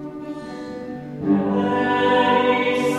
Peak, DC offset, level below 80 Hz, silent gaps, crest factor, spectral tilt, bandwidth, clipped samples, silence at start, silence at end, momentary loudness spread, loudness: -6 dBFS; under 0.1%; -58 dBFS; none; 16 dB; -6 dB/octave; 13 kHz; under 0.1%; 0 s; 0 s; 16 LU; -19 LUFS